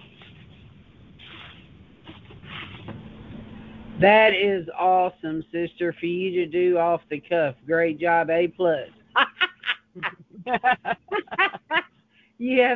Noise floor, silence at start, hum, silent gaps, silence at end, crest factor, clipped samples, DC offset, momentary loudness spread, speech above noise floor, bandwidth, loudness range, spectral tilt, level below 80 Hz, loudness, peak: -61 dBFS; 1.25 s; none; none; 0 s; 20 dB; under 0.1%; under 0.1%; 20 LU; 39 dB; 5 kHz; 20 LU; -7.5 dB/octave; -58 dBFS; -23 LUFS; -4 dBFS